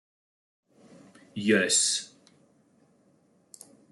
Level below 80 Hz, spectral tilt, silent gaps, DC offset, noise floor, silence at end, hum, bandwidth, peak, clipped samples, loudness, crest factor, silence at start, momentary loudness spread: -78 dBFS; -2 dB/octave; none; under 0.1%; -65 dBFS; 1.85 s; none; 12 kHz; -10 dBFS; under 0.1%; -24 LUFS; 22 dB; 1.35 s; 21 LU